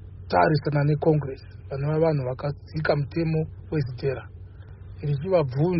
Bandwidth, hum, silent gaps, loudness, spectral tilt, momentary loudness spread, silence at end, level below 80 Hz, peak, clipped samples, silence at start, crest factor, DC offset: 5.8 kHz; none; none; -25 LUFS; -7 dB/octave; 17 LU; 0 s; -48 dBFS; -6 dBFS; under 0.1%; 0 s; 18 dB; under 0.1%